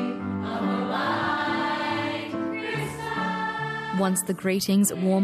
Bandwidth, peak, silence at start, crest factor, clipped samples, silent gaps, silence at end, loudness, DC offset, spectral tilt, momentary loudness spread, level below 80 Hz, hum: 15 kHz; -10 dBFS; 0 s; 16 dB; under 0.1%; none; 0 s; -26 LUFS; under 0.1%; -4.5 dB/octave; 7 LU; -62 dBFS; none